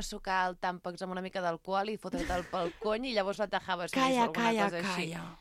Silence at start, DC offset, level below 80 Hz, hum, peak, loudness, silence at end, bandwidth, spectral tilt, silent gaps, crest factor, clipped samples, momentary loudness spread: 0 s; under 0.1%; -54 dBFS; none; -14 dBFS; -33 LUFS; 0 s; 16 kHz; -4.5 dB/octave; none; 18 dB; under 0.1%; 8 LU